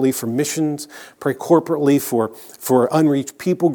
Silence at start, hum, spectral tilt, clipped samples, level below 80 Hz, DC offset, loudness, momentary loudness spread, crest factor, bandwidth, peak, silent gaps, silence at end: 0 s; none; -6 dB/octave; under 0.1%; -70 dBFS; under 0.1%; -19 LUFS; 10 LU; 18 dB; over 20 kHz; 0 dBFS; none; 0 s